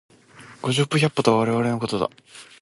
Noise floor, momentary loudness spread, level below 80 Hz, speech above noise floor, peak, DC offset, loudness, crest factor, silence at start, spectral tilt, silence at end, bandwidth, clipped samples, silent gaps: -47 dBFS; 8 LU; -58 dBFS; 25 dB; -2 dBFS; under 0.1%; -22 LUFS; 20 dB; 0.4 s; -5.5 dB/octave; 0.2 s; 11.5 kHz; under 0.1%; none